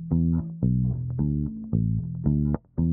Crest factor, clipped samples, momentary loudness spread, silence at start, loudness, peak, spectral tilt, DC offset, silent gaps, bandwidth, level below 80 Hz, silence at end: 16 dB; under 0.1%; 3 LU; 0 s; -26 LUFS; -10 dBFS; -16.5 dB/octave; under 0.1%; none; 1.9 kHz; -38 dBFS; 0 s